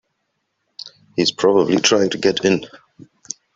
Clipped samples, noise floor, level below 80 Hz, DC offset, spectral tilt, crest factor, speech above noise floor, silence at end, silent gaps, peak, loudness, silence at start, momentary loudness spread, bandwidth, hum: under 0.1%; -72 dBFS; -58 dBFS; under 0.1%; -3.5 dB/octave; 18 dB; 56 dB; 0.8 s; none; -2 dBFS; -17 LUFS; 0.85 s; 21 LU; 7.8 kHz; none